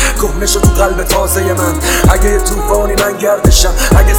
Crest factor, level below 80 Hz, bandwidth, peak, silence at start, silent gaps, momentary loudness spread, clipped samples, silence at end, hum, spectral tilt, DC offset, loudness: 10 dB; -14 dBFS; 20 kHz; 0 dBFS; 0 s; none; 4 LU; 0.5%; 0 s; none; -4 dB/octave; under 0.1%; -11 LUFS